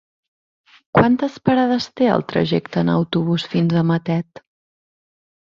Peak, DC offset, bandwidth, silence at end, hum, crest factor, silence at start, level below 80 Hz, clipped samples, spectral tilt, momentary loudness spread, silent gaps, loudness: 0 dBFS; under 0.1%; 7.2 kHz; 1.25 s; none; 20 dB; 0.95 s; -54 dBFS; under 0.1%; -7.5 dB/octave; 4 LU; none; -19 LUFS